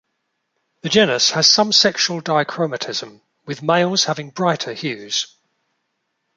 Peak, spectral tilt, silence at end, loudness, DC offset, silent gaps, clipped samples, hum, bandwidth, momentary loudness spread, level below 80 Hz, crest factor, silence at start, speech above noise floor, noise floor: 0 dBFS; -2.5 dB/octave; 1.1 s; -17 LUFS; under 0.1%; none; under 0.1%; none; 11 kHz; 14 LU; -64 dBFS; 20 dB; 0.85 s; 55 dB; -73 dBFS